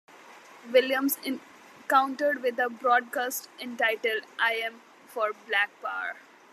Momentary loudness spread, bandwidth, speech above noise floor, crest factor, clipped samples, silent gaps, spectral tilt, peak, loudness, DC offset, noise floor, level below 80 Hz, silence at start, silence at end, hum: 13 LU; 14.5 kHz; 23 dB; 22 dB; under 0.1%; none; -1 dB/octave; -8 dBFS; -27 LUFS; under 0.1%; -50 dBFS; under -90 dBFS; 0.15 s; 0.35 s; none